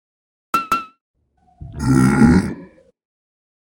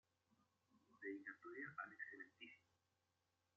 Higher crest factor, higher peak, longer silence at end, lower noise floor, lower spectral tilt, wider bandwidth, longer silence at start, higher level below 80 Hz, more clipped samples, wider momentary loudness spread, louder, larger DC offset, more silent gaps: about the same, 20 dB vs 20 dB; first, 0 dBFS vs -38 dBFS; first, 1.15 s vs 0.95 s; second, -43 dBFS vs -88 dBFS; first, -7 dB/octave vs -2.5 dB/octave; first, 17 kHz vs 7 kHz; second, 0.55 s vs 0.7 s; first, -36 dBFS vs under -90 dBFS; neither; first, 18 LU vs 8 LU; first, -17 LUFS vs -55 LUFS; neither; first, 1.01-1.14 s vs none